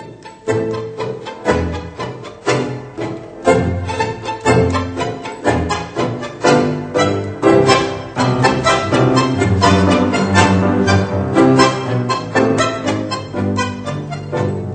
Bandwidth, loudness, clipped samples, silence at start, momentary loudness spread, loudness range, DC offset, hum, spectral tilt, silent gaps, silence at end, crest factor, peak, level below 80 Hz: 9 kHz; -16 LUFS; under 0.1%; 0 s; 12 LU; 6 LU; under 0.1%; none; -5.5 dB/octave; none; 0 s; 16 dB; 0 dBFS; -42 dBFS